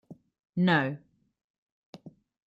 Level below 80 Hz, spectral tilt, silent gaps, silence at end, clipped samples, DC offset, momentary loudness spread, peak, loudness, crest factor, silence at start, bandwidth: -74 dBFS; -8 dB/octave; 0.49-0.53 s, 1.44-1.93 s; 0.4 s; under 0.1%; under 0.1%; 26 LU; -12 dBFS; -27 LUFS; 20 dB; 0.1 s; 7.4 kHz